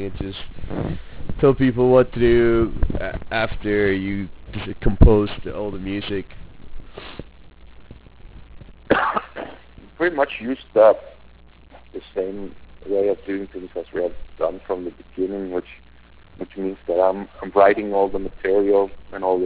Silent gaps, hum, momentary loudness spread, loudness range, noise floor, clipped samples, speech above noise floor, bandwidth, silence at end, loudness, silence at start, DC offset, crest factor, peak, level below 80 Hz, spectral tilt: none; none; 19 LU; 9 LU; -48 dBFS; under 0.1%; 28 dB; 4 kHz; 0 s; -21 LUFS; 0 s; 0.3%; 18 dB; -2 dBFS; -32 dBFS; -11 dB/octave